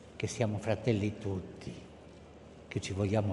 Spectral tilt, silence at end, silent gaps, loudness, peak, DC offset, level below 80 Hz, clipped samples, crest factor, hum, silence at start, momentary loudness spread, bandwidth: -6.5 dB/octave; 0 s; none; -35 LUFS; -16 dBFS; under 0.1%; -62 dBFS; under 0.1%; 20 dB; none; 0 s; 22 LU; 11.5 kHz